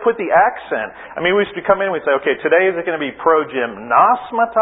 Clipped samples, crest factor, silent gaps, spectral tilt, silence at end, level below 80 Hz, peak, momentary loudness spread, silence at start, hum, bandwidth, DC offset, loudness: under 0.1%; 16 dB; none; -10 dB/octave; 0 s; -56 dBFS; 0 dBFS; 9 LU; 0 s; none; 4 kHz; under 0.1%; -16 LUFS